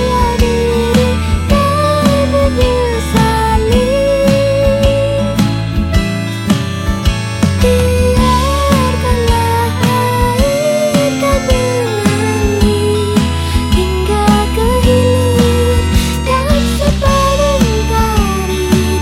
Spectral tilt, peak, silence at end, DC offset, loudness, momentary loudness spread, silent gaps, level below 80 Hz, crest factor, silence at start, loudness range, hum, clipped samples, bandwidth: -5.5 dB/octave; 0 dBFS; 0 s; under 0.1%; -12 LUFS; 4 LU; none; -18 dBFS; 10 dB; 0 s; 2 LU; none; under 0.1%; 16.5 kHz